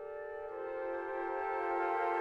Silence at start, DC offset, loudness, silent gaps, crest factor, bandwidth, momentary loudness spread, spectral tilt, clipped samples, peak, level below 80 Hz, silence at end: 0 s; under 0.1%; -38 LUFS; none; 14 dB; 8.2 kHz; 10 LU; -5.5 dB/octave; under 0.1%; -24 dBFS; -70 dBFS; 0 s